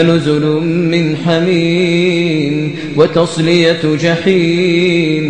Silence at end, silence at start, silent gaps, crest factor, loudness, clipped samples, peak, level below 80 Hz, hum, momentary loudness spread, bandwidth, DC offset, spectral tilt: 0 s; 0 s; none; 12 dB; -12 LUFS; under 0.1%; 0 dBFS; -48 dBFS; none; 3 LU; 9.6 kHz; 0.7%; -6.5 dB/octave